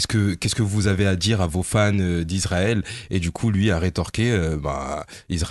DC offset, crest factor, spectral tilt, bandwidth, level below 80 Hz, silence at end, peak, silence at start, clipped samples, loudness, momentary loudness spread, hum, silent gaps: under 0.1%; 14 dB; -5.5 dB/octave; 12.5 kHz; -34 dBFS; 0 s; -8 dBFS; 0 s; under 0.1%; -22 LUFS; 7 LU; none; none